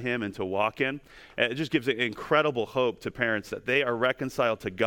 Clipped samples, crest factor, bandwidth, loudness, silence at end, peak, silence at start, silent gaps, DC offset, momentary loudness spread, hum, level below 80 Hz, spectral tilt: under 0.1%; 20 dB; 18 kHz; -27 LUFS; 0 s; -8 dBFS; 0 s; none; under 0.1%; 6 LU; none; -60 dBFS; -5.5 dB/octave